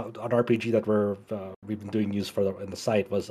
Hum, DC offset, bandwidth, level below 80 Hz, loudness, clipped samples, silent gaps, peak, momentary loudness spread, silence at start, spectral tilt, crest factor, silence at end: none; under 0.1%; 14 kHz; -66 dBFS; -28 LUFS; under 0.1%; 1.56-1.62 s; -12 dBFS; 12 LU; 0 s; -6.5 dB/octave; 16 dB; 0 s